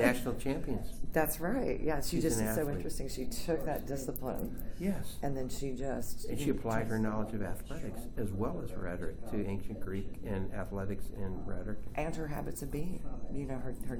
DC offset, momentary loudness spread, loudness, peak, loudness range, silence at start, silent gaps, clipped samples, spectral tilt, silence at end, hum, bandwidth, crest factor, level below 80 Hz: under 0.1%; 9 LU; -37 LUFS; -14 dBFS; 5 LU; 0 s; none; under 0.1%; -5.5 dB/octave; 0 s; none; over 20 kHz; 20 dB; -42 dBFS